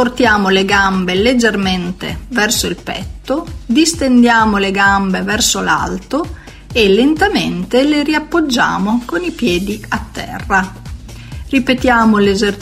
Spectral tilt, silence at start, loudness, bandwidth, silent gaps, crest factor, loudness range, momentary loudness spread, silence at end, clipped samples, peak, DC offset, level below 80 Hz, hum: -4 dB/octave; 0 s; -13 LUFS; 16 kHz; none; 14 dB; 4 LU; 13 LU; 0 s; under 0.1%; 0 dBFS; under 0.1%; -32 dBFS; none